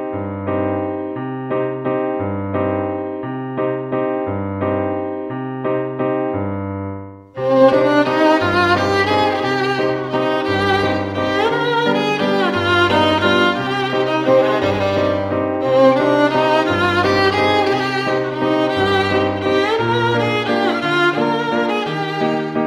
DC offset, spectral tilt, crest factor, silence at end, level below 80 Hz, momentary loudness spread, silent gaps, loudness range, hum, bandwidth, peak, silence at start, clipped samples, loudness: under 0.1%; -6 dB/octave; 16 dB; 0 s; -52 dBFS; 9 LU; none; 6 LU; none; 15 kHz; 0 dBFS; 0 s; under 0.1%; -17 LUFS